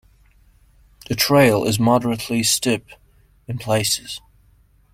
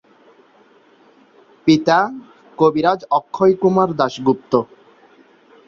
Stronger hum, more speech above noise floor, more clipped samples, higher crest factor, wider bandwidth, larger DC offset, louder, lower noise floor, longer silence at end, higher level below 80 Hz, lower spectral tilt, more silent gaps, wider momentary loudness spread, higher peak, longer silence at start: neither; about the same, 37 dB vs 36 dB; neither; about the same, 20 dB vs 18 dB; first, 16.5 kHz vs 7.2 kHz; neither; about the same, -18 LUFS vs -17 LUFS; about the same, -55 dBFS vs -52 dBFS; second, 0.75 s vs 1.05 s; first, -50 dBFS vs -58 dBFS; second, -4 dB/octave vs -6.5 dB/octave; neither; first, 16 LU vs 7 LU; about the same, -2 dBFS vs -2 dBFS; second, 1.1 s vs 1.65 s